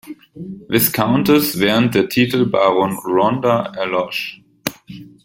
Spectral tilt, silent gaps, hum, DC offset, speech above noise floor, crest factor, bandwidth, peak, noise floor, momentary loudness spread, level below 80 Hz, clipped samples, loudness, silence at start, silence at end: -5 dB/octave; none; none; under 0.1%; 21 dB; 18 dB; 16.5 kHz; 0 dBFS; -37 dBFS; 16 LU; -52 dBFS; under 0.1%; -16 LUFS; 0.05 s; 0.15 s